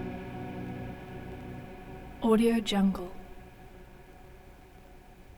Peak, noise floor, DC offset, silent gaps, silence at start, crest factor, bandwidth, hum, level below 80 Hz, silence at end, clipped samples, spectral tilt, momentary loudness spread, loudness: -12 dBFS; -52 dBFS; under 0.1%; none; 0 s; 20 dB; 20 kHz; none; -50 dBFS; 0 s; under 0.1%; -6.5 dB/octave; 27 LU; -31 LUFS